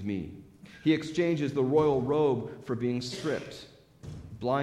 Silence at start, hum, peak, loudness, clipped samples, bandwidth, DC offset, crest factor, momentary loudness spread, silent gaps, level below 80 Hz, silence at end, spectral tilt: 0 s; none; -12 dBFS; -29 LUFS; under 0.1%; 12.5 kHz; under 0.1%; 18 dB; 20 LU; none; -58 dBFS; 0 s; -6.5 dB/octave